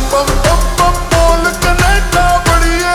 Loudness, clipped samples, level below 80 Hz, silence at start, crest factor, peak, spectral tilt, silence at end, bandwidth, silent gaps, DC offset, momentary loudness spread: -11 LUFS; under 0.1%; -14 dBFS; 0 s; 10 dB; 0 dBFS; -4 dB/octave; 0 s; 20 kHz; none; under 0.1%; 2 LU